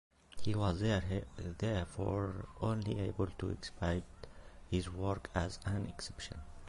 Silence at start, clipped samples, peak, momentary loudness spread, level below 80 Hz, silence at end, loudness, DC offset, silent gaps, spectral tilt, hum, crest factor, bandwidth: 0.25 s; under 0.1%; -18 dBFS; 12 LU; -48 dBFS; 0 s; -39 LUFS; under 0.1%; none; -6.5 dB/octave; none; 20 dB; 11.5 kHz